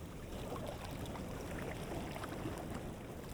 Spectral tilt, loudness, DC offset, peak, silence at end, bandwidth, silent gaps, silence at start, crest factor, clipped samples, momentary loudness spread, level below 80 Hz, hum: -5.5 dB/octave; -45 LUFS; under 0.1%; -30 dBFS; 0 s; over 20 kHz; none; 0 s; 14 dB; under 0.1%; 3 LU; -52 dBFS; none